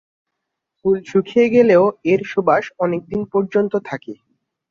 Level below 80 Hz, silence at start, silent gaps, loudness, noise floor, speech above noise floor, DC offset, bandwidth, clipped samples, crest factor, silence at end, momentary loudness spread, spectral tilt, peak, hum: -58 dBFS; 0.85 s; none; -17 LUFS; -79 dBFS; 62 dB; under 0.1%; 7 kHz; under 0.1%; 16 dB; 0.55 s; 11 LU; -7.5 dB/octave; -2 dBFS; none